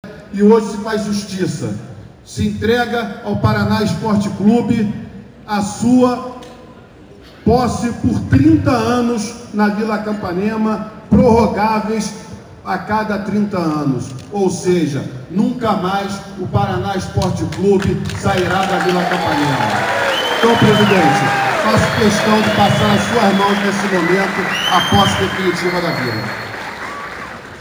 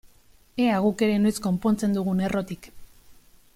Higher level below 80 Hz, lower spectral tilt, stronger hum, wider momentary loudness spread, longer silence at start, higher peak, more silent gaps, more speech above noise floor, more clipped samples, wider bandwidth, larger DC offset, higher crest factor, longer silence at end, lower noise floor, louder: first, -40 dBFS vs -54 dBFS; about the same, -5.5 dB/octave vs -6.5 dB/octave; neither; about the same, 13 LU vs 12 LU; second, 0.05 s vs 0.55 s; first, 0 dBFS vs -10 dBFS; neither; second, 25 dB vs 32 dB; neither; first, over 20 kHz vs 15.5 kHz; neither; about the same, 16 dB vs 16 dB; second, 0 s vs 0.4 s; second, -39 dBFS vs -56 dBFS; first, -15 LUFS vs -24 LUFS